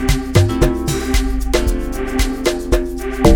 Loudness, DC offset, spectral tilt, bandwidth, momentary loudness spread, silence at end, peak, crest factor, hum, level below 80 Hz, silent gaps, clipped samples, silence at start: -18 LUFS; under 0.1%; -5.5 dB/octave; 18.5 kHz; 6 LU; 0 s; 0 dBFS; 14 dB; none; -20 dBFS; none; under 0.1%; 0 s